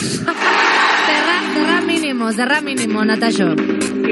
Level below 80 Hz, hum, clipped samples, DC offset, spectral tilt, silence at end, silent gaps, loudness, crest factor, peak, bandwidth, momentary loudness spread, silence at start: -60 dBFS; none; under 0.1%; under 0.1%; -3.5 dB/octave; 0 s; none; -15 LUFS; 14 dB; -2 dBFS; 12 kHz; 6 LU; 0 s